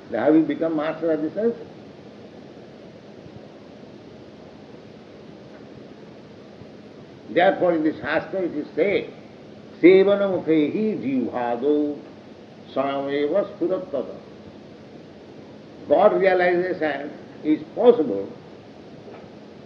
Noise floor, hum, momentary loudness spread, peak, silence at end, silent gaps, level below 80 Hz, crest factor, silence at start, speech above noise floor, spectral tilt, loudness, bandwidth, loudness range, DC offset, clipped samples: -43 dBFS; none; 26 LU; -2 dBFS; 0 s; none; -68 dBFS; 22 dB; 0.05 s; 23 dB; -8 dB/octave; -21 LUFS; 6.4 kHz; 22 LU; under 0.1%; under 0.1%